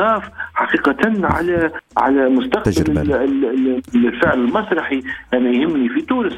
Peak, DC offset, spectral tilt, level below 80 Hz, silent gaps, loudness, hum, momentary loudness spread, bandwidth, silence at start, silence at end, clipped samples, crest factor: -2 dBFS; under 0.1%; -6.5 dB/octave; -38 dBFS; none; -17 LUFS; none; 5 LU; 12.5 kHz; 0 s; 0 s; under 0.1%; 16 dB